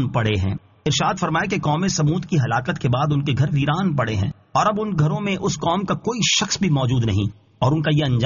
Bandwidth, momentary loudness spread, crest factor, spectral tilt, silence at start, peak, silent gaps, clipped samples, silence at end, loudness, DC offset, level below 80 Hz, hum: 7.4 kHz; 5 LU; 14 dB; -5 dB/octave; 0 s; -6 dBFS; none; under 0.1%; 0 s; -21 LUFS; under 0.1%; -46 dBFS; none